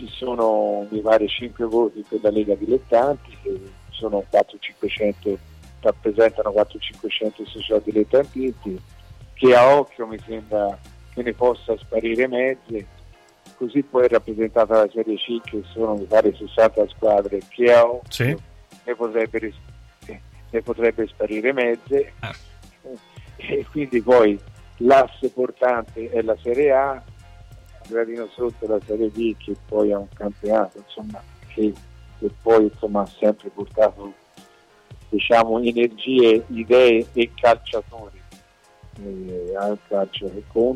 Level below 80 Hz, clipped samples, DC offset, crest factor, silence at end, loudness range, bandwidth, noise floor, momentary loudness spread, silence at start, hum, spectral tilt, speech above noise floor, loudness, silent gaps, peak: -48 dBFS; under 0.1%; under 0.1%; 16 dB; 0 s; 6 LU; 13 kHz; -52 dBFS; 17 LU; 0 s; none; -6.5 dB/octave; 32 dB; -20 LUFS; none; -6 dBFS